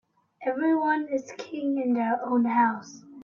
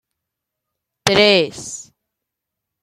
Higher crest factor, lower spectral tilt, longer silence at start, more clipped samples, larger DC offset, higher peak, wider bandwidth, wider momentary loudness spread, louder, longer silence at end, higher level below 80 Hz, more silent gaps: about the same, 16 dB vs 20 dB; first, -5.5 dB/octave vs -3 dB/octave; second, 0.4 s vs 1.05 s; neither; neither; second, -10 dBFS vs 0 dBFS; second, 7.2 kHz vs 16 kHz; second, 12 LU vs 19 LU; second, -26 LUFS vs -15 LUFS; second, 0 s vs 1 s; second, -78 dBFS vs -54 dBFS; neither